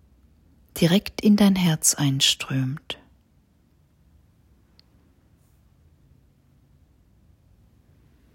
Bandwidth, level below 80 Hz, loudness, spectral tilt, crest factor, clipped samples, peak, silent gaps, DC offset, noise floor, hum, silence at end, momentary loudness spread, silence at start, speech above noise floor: 16 kHz; -56 dBFS; -21 LUFS; -4 dB/octave; 22 dB; under 0.1%; -4 dBFS; none; under 0.1%; -61 dBFS; none; 5.4 s; 18 LU; 0.75 s; 40 dB